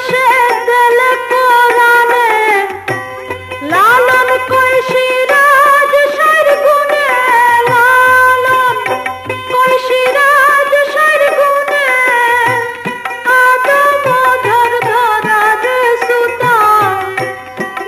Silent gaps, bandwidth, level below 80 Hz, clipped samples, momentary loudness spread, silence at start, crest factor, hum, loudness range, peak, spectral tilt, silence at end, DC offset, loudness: none; 14 kHz; -54 dBFS; under 0.1%; 10 LU; 0 s; 10 dB; none; 2 LU; 0 dBFS; -3 dB/octave; 0 s; under 0.1%; -9 LUFS